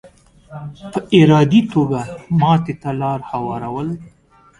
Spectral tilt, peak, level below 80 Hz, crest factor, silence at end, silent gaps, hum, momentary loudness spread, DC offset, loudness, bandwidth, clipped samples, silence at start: -7.5 dB/octave; 0 dBFS; -50 dBFS; 16 dB; 0.5 s; none; none; 20 LU; under 0.1%; -17 LUFS; 11 kHz; under 0.1%; 0.05 s